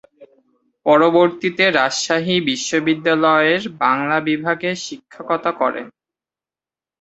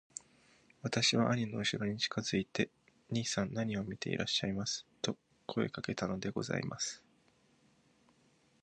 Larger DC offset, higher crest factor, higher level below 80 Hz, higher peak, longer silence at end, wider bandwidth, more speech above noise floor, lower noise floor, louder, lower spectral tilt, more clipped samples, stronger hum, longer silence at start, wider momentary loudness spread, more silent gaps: neither; about the same, 18 dB vs 20 dB; about the same, -64 dBFS vs -66 dBFS; first, 0 dBFS vs -18 dBFS; second, 1.15 s vs 1.65 s; second, 8.2 kHz vs 10.5 kHz; first, over 73 dB vs 34 dB; first, under -90 dBFS vs -70 dBFS; first, -17 LUFS vs -36 LUFS; about the same, -4 dB/octave vs -4 dB/octave; neither; neither; second, 0.2 s vs 0.85 s; about the same, 10 LU vs 9 LU; neither